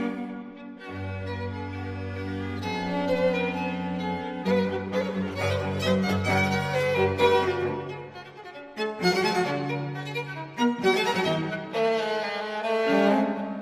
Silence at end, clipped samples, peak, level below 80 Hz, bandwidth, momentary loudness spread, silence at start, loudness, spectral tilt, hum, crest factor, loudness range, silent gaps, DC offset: 0 s; under 0.1%; -8 dBFS; -60 dBFS; 15 kHz; 12 LU; 0 s; -27 LUFS; -6 dB/octave; none; 18 dB; 4 LU; none; under 0.1%